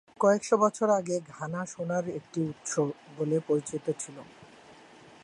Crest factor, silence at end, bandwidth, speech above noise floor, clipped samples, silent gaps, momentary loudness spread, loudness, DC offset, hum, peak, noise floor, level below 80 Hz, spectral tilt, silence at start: 20 dB; 0.5 s; 11.5 kHz; 24 dB; under 0.1%; none; 11 LU; -29 LUFS; under 0.1%; none; -10 dBFS; -53 dBFS; -74 dBFS; -5.5 dB/octave; 0.2 s